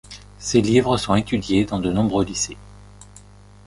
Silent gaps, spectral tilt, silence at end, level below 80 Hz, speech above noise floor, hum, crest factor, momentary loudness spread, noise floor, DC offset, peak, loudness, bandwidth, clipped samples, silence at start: none; -5 dB/octave; 0.5 s; -42 dBFS; 26 dB; 50 Hz at -35 dBFS; 18 dB; 12 LU; -46 dBFS; under 0.1%; -4 dBFS; -20 LUFS; 11.5 kHz; under 0.1%; 0.1 s